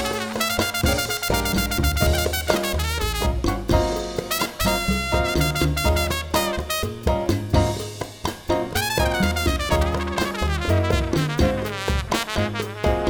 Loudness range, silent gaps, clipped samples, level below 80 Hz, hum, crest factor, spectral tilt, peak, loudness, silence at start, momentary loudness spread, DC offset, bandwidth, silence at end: 1 LU; none; under 0.1%; -28 dBFS; none; 20 dB; -4.5 dB/octave; -2 dBFS; -22 LUFS; 0 s; 5 LU; 0.1%; over 20 kHz; 0 s